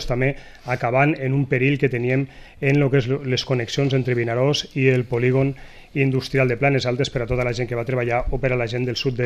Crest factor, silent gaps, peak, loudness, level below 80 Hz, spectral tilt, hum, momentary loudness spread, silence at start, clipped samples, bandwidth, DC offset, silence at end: 18 dB; none; -4 dBFS; -21 LUFS; -38 dBFS; -6.5 dB/octave; none; 6 LU; 0 s; under 0.1%; 8.6 kHz; under 0.1%; 0 s